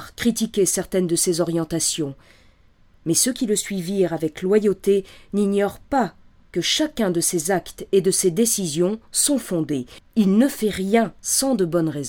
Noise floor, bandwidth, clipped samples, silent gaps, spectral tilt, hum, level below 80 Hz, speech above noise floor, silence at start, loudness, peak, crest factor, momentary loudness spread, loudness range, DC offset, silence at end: -54 dBFS; 18.5 kHz; under 0.1%; none; -4 dB/octave; none; -52 dBFS; 33 dB; 0 s; -21 LUFS; -4 dBFS; 18 dB; 6 LU; 2 LU; under 0.1%; 0 s